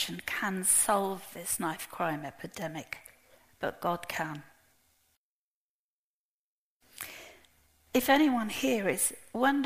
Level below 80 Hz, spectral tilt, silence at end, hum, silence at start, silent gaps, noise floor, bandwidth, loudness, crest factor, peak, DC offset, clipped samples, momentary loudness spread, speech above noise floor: -66 dBFS; -3 dB/octave; 0 s; none; 0 s; 5.17-6.80 s; under -90 dBFS; 15.5 kHz; -30 LUFS; 22 dB; -12 dBFS; under 0.1%; under 0.1%; 18 LU; over 59 dB